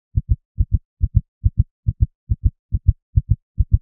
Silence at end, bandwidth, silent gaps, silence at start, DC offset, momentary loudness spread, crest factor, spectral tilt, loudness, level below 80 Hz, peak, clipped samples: 0.05 s; 0.5 kHz; 0.45-0.55 s, 0.85-0.97 s, 1.28-1.41 s, 1.71-1.83 s, 2.15-2.27 s, 2.59-2.69 s, 3.02-3.13 s, 3.42-3.55 s; 0.15 s; under 0.1%; 3 LU; 18 dB; -27.5 dB/octave; -23 LUFS; -22 dBFS; 0 dBFS; under 0.1%